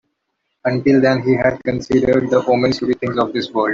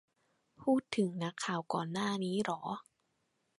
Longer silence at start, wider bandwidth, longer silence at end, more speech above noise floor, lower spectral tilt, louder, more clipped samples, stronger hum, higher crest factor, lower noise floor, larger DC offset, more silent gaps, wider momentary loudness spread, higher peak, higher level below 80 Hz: about the same, 0.65 s vs 0.6 s; second, 7.4 kHz vs 11.5 kHz; second, 0 s vs 0.8 s; first, 57 dB vs 45 dB; first, -7 dB/octave vs -5.5 dB/octave; first, -17 LUFS vs -36 LUFS; neither; neither; second, 14 dB vs 20 dB; second, -73 dBFS vs -80 dBFS; neither; neither; about the same, 6 LU vs 7 LU; first, -2 dBFS vs -16 dBFS; first, -48 dBFS vs -78 dBFS